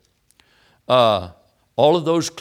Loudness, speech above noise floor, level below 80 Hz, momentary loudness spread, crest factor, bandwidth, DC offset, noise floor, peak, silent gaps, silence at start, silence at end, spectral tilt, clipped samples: -18 LUFS; 42 dB; -58 dBFS; 13 LU; 20 dB; 15.5 kHz; under 0.1%; -59 dBFS; 0 dBFS; none; 0.9 s; 0 s; -5 dB/octave; under 0.1%